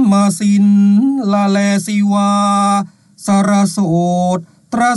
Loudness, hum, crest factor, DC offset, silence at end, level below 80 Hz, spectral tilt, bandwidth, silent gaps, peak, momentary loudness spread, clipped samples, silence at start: -13 LUFS; none; 10 dB; under 0.1%; 0 s; -60 dBFS; -6 dB/octave; 12 kHz; none; -4 dBFS; 8 LU; under 0.1%; 0 s